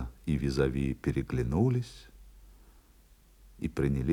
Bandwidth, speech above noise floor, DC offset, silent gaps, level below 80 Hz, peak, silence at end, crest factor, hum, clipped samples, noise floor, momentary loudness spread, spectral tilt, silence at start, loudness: 13.5 kHz; 30 dB; under 0.1%; none; -44 dBFS; -14 dBFS; 0 s; 18 dB; none; under 0.1%; -60 dBFS; 10 LU; -8 dB/octave; 0 s; -31 LUFS